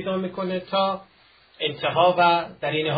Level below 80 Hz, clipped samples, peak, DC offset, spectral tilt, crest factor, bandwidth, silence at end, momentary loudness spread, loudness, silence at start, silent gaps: -64 dBFS; under 0.1%; -4 dBFS; under 0.1%; -10 dB/octave; 20 dB; 5 kHz; 0 s; 11 LU; -23 LUFS; 0 s; none